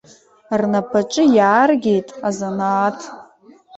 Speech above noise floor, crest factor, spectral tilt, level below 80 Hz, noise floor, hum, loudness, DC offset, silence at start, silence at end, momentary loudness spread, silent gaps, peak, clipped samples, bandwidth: 31 dB; 16 dB; -5.5 dB/octave; -62 dBFS; -47 dBFS; none; -17 LUFS; under 0.1%; 0.5 s; 0 s; 11 LU; none; -2 dBFS; under 0.1%; 8.2 kHz